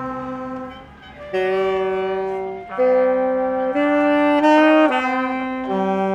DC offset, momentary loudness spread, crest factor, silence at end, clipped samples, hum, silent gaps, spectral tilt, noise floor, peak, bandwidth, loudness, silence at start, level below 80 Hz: under 0.1%; 15 LU; 16 dB; 0 s; under 0.1%; none; none; -6.5 dB/octave; -39 dBFS; -4 dBFS; 8.4 kHz; -19 LUFS; 0 s; -54 dBFS